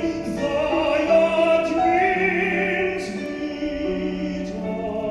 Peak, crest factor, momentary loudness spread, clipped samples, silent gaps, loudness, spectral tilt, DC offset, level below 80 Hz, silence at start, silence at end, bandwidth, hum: -6 dBFS; 16 dB; 10 LU; under 0.1%; none; -22 LUFS; -6 dB/octave; under 0.1%; -46 dBFS; 0 s; 0 s; 11.5 kHz; none